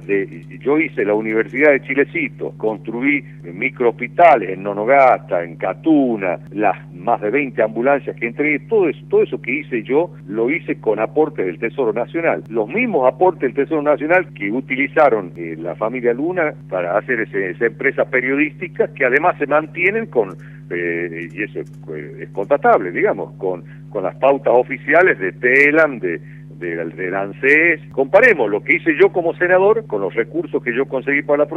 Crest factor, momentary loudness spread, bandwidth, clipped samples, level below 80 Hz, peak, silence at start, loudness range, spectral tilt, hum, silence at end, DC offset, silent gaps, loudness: 16 dB; 12 LU; 6.8 kHz; under 0.1%; -56 dBFS; 0 dBFS; 0 s; 5 LU; -8 dB/octave; none; 0 s; under 0.1%; none; -17 LUFS